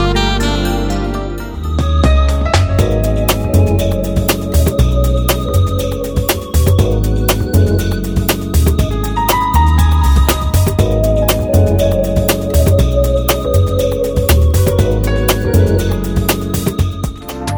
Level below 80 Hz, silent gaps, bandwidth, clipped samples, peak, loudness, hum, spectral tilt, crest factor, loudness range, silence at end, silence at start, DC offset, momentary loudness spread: -16 dBFS; none; over 20 kHz; under 0.1%; 0 dBFS; -14 LUFS; none; -6 dB/octave; 12 dB; 2 LU; 0 s; 0 s; under 0.1%; 5 LU